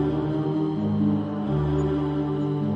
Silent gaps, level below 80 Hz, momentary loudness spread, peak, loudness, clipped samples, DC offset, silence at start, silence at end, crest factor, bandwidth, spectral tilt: none; -44 dBFS; 2 LU; -12 dBFS; -25 LUFS; under 0.1%; under 0.1%; 0 s; 0 s; 12 dB; 7.2 kHz; -10 dB/octave